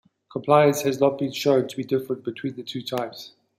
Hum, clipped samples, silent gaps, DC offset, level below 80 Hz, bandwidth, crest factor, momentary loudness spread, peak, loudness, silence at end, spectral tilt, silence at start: none; under 0.1%; none; under 0.1%; -68 dBFS; 16 kHz; 20 dB; 14 LU; -4 dBFS; -23 LUFS; 0.3 s; -5.5 dB/octave; 0.35 s